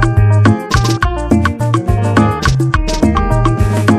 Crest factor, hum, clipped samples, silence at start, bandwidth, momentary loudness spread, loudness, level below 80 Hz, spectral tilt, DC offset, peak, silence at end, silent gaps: 12 dB; none; under 0.1%; 0 s; 13 kHz; 4 LU; -13 LUFS; -20 dBFS; -6.5 dB/octave; under 0.1%; 0 dBFS; 0 s; none